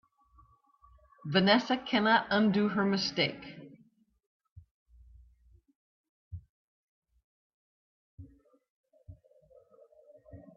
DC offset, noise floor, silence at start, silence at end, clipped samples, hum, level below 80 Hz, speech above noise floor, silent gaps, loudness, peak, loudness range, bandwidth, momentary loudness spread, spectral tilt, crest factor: under 0.1%; -66 dBFS; 1.25 s; 0.15 s; under 0.1%; none; -66 dBFS; 38 dB; 4.26-4.40 s, 4.51-4.56 s, 4.71-4.86 s, 5.75-6.31 s, 6.49-7.02 s, 7.24-8.18 s, 8.70-8.84 s; -28 LUFS; -12 dBFS; 9 LU; 7 kHz; 25 LU; -5.5 dB/octave; 24 dB